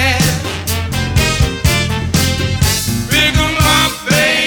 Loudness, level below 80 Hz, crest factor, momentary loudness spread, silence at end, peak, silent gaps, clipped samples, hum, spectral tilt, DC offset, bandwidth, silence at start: -13 LUFS; -24 dBFS; 14 dB; 6 LU; 0 s; 0 dBFS; none; under 0.1%; none; -3.5 dB/octave; under 0.1%; over 20 kHz; 0 s